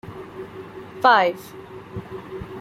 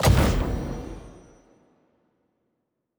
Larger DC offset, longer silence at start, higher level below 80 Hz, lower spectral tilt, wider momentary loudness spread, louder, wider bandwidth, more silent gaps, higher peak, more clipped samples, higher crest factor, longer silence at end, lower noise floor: neither; about the same, 0.05 s vs 0 s; second, -54 dBFS vs -32 dBFS; about the same, -5 dB/octave vs -5.5 dB/octave; about the same, 22 LU vs 23 LU; first, -18 LUFS vs -25 LUFS; second, 16 kHz vs over 20 kHz; neither; first, -2 dBFS vs -6 dBFS; neither; about the same, 22 dB vs 20 dB; second, 0 s vs 1.85 s; second, -38 dBFS vs -77 dBFS